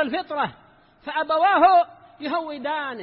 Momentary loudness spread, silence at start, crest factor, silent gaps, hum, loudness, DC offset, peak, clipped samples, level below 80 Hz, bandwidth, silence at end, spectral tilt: 14 LU; 0 s; 16 dB; none; none; -22 LUFS; under 0.1%; -6 dBFS; under 0.1%; -64 dBFS; 5.6 kHz; 0 s; -8.5 dB/octave